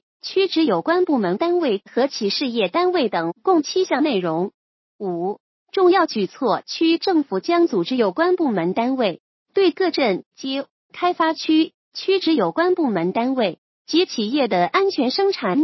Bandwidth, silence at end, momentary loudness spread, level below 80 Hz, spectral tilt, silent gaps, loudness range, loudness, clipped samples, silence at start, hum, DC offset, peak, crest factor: 6.2 kHz; 0 s; 8 LU; -76 dBFS; -5.5 dB/octave; 4.54-4.99 s, 5.40-5.66 s, 9.20-9.46 s, 10.26-10.31 s, 10.70-10.89 s, 11.74-11.92 s, 13.58-13.85 s; 2 LU; -20 LUFS; under 0.1%; 0.25 s; none; under 0.1%; -4 dBFS; 16 dB